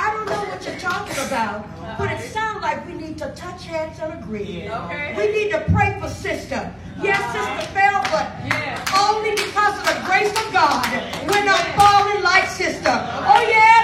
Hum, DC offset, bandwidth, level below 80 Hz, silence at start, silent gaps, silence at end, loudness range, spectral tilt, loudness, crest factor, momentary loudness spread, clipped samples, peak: none; under 0.1%; 16 kHz; -44 dBFS; 0 s; none; 0 s; 9 LU; -3.5 dB/octave; -19 LUFS; 18 dB; 14 LU; under 0.1%; 0 dBFS